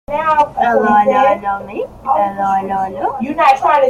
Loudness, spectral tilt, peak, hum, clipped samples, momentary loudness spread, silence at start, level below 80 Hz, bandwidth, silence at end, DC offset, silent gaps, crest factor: -14 LUFS; -6 dB/octave; 0 dBFS; none; under 0.1%; 9 LU; 0.1 s; -46 dBFS; 13.5 kHz; 0 s; under 0.1%; none; 14 dB